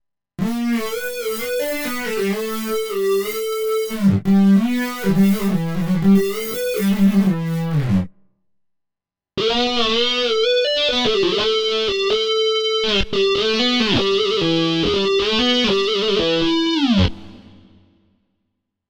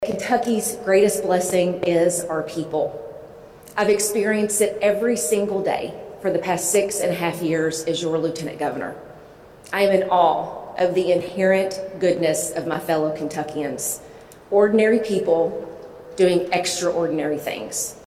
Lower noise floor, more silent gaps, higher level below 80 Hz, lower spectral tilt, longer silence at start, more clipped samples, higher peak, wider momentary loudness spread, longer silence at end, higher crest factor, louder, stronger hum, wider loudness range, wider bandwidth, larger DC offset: first, -85 dBFS vs -44 dBFS; neither; first, -42 dBFS vs -58 dBFS; about the same, -5 dB/octave vs -4 dB/octave; first, 0.4 s vs 0 s; neither; about the same, -4 dBFS vs -4 dBFS; second, 7 LU vs 10 LU; first, 1.5 s vs 0 s; about the same, 14 dB vs 18 dB; first, -18 LUFS vs -21 LUFS; neither; about the same, 4 LU vs 2 LU; first, over 20 kHz vs 16 kHz; neither